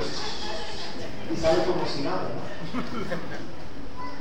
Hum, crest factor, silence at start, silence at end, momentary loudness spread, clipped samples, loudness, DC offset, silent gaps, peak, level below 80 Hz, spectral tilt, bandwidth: none; 20 dB; 0 s; 0 s; 14 LU; under 0.1%; -30 LUFS; 5%; none; -10 dBFS; -48 dBFS; -5 dB/octave; 16 kHz